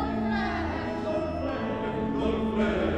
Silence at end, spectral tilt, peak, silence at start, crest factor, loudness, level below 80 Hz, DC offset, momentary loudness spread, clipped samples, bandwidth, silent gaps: 0 s; -7.5 dB/octave; -14 dBFS; 0 s; 14 dB; -29 LUFS; -42 dBFS; under 0.1%; 4 LU; under 0.1%; 8.4 kHz; none